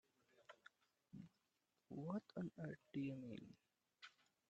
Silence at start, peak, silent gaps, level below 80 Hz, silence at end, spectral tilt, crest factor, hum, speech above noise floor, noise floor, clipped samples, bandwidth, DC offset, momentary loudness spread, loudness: 0.4 s; -36 dBFS; none; -86 dBFS; 0.4 s; -8 dB/octave; 20 dB; none; 38 dB; -88 dBFS; under 0.1%; 8.4 kHz; under 0.1%; 17 LU; -52 LUFS